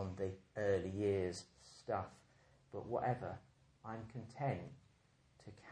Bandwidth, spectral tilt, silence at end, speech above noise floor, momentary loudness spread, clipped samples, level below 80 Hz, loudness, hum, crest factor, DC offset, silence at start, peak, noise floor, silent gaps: 10.5 kHz; -6.5 dB/octave; 0 s; 30 dB; 18 LU; under 0.1%; -72 dBFS; -42 LUFS; none; 20 dB; under 0.1%; 0 s; -24 dBFS; -72 dBFS; none